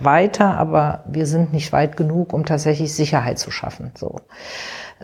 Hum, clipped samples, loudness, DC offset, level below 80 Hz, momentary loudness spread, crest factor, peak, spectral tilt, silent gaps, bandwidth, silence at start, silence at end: none; under 0.1%; -19 LUFS; under 0.1%; -48 dBFS; 15 LU; 18 dB; -2 dBFS; -6 dB/octave; none; 13 kHz; 0 s; 0 s